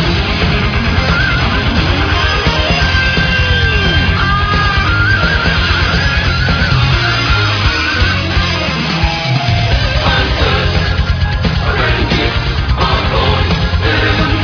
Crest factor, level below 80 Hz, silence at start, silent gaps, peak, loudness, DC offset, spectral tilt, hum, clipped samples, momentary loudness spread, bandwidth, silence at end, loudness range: 12 dB; -18 dBFS; 0 s; none; 0 dBFS; -12 LUFS; under 0.1%; -5.5 dB/octave; none; under 0.1%; 3 LU; 5.4 kHz; 0 s; 2 LU